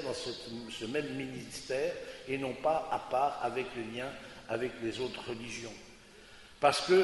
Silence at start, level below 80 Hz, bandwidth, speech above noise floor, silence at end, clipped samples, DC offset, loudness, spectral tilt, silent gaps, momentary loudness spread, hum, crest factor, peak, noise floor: 0 s; -64 dBFS; 11.5 kHz; 21 dB; 0 s; under 0.1%; under 0.1%; -35 LUFS; -4 dB/octave; none; 16 LU; none; 22 dB; -12 dBFS; -55 dBFS